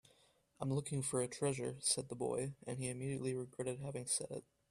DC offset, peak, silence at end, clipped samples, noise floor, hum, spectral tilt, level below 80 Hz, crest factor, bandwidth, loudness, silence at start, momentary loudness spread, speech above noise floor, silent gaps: under 0.1%; -22 dBFS; 0.3 s; under 0.1%; -72 dBFS; none; -4.5 dB/octave; -72 dBFS; 20 dB; 14.5 kHz; -40 LUFS; 0.6 s; 8 LU; 32 dB; none